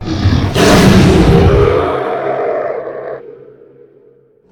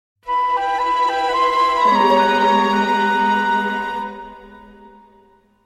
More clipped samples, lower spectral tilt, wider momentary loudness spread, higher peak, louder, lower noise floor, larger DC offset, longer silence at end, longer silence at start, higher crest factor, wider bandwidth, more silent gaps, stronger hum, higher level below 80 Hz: first, 0.2% vs under 0.1%; first, -6 dB/octave vs -4.5 dB/octave; first, 17 LU vs 11 LU; about the same, 0 dBFS vs -2 dBFS; first, -10 LUFS vs -17 LUFS; second, -47 dBFS vs -53 dBFS; neither; about the same, 1.2 s vs 1.15 s; second, 0 s vs 0.25 s; about the same, 12 dB vs 16 dB; first, 19.5 kHz vs 13.5 kHz; neither; neither; first, -22 dBFS vs -52 dBFS